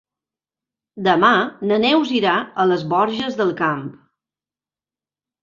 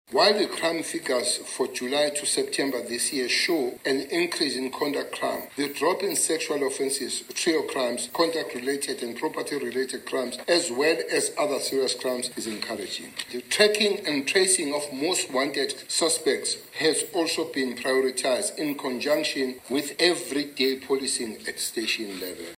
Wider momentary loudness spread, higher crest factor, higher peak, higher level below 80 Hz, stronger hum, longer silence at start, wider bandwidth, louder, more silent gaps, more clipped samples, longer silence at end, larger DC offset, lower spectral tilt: about the same, 7 LU vs 8 LU; about the same, 18 dB vs 22 dB; about the same, -2 dBFS vs -4 dBFS; first, -64 dBFS vs -72 dBFS; first, 50 Hz at -60 dBFS vs none; first, 0.95 s vs 0.1 s; second, 7.4 kHz vs 16 kHz; first, -18 LUFS vs -25 LUFS; neither; neither; first, 1.5 s vs 0 s; neither; first, -6 dB/octave vs -1.5 dB/octave